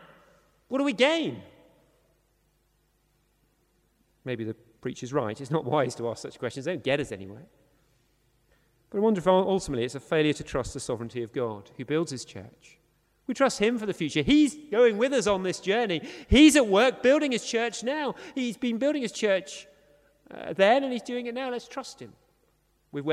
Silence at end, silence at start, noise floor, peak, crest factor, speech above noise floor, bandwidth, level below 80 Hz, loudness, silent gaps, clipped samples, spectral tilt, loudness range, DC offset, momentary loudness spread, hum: 0 s; 0.7 s; -69 dBFS; -6 dBFS; 22 dB; 43 dB; 13.5 kHz; -50 dBFS; -26 LUFS; none; under 0.1%; -4.5 dB/octave; 11 LU; under 0.1%; 16 LU; none